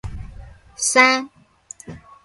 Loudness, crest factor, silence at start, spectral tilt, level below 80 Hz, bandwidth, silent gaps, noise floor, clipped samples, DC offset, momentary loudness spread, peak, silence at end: -16 LUFS; 22 dB; 0.05 s; -2 dB/octave; -42 dBFS; 11.5 kHz; none; -44 dBFS; under 0.1%; under 0.1%; 25 LU; 0 dBFS; 0.25 s